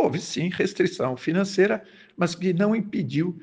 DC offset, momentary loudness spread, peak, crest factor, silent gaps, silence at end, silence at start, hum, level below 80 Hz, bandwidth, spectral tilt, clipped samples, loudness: under 0.1%; 6 LU; -8 dBFS; 16 dB; none; 0.05 s; 0 s; none; -66 dBFS; 9.6 kHz; -6 dB/octave; under 0.1%; -25 LUFS